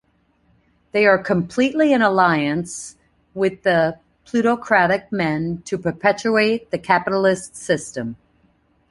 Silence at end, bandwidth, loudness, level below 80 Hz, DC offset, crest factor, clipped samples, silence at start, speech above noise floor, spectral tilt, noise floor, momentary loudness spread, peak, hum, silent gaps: 0.75 s; 11.5 kHz; -19 LUFS; -56 dBFS; under 0.1%; 18 dB; under 0.1%; 0.95 s; 43 dB; -5.5 dB/octave; -61 dBFS; 10 LU; -2 dBFS; none; none